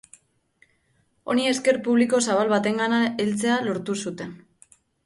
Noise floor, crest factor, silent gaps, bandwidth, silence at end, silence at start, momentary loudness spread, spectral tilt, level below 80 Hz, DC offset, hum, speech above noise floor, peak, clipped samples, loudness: -67 dBFS; 16 dB; none; 11.5 kHz; 0.7 s; 1.25 s; 11 LU; -4 dB/octave; -66 dBFS; under 0.1%; none; 45 dB; -8 dBFS; under 0.1%; -23 LUFS